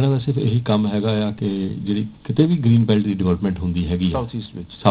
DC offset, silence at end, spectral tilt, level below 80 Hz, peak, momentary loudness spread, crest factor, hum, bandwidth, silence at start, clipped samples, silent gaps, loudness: under 0.1%; 0 s; -12 dB/octave; -38 dBFS; 0 dBFS; 8 LU; 18 dB; none; 4 kHz; 0 s; under 0.1%; none; -20 LUFS